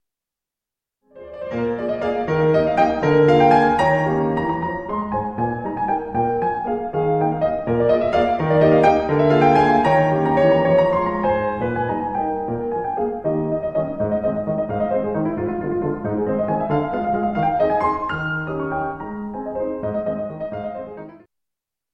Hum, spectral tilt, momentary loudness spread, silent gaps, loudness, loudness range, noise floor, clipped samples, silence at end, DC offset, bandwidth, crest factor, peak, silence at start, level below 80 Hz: none; -8 dB/octave; 11 LU; none; -20 LUFS; 7 LU; -87 dBFS; under 0.1%; 0.75 s; under 0.1%; 8.6 kHz; 16 dB; -4 dBFS; 1.15 s; -46 dBFS